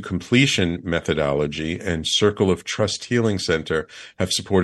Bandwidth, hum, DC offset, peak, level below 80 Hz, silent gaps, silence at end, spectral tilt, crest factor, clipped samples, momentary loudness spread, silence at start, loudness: 12.5 kHz; none; under 0.1%; -2 dBFS; -44 dBFS; none; 0 s; -4.5 dB/octave; 18 dB; under 0.1%; 8 LU; 0 s; -21 LUFS